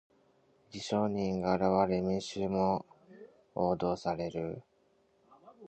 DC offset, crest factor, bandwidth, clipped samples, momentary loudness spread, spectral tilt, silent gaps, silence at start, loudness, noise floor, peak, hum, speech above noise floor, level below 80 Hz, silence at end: under 0.1%; 20 dB; 8.8 kHz; under 0.1%; 13 LU; -6.5 dB/octave; none; 0.7 s; -33 LUFS; -70 dBFS; -14 dBFS; none; 39 dB; -60 dBFS; 0 s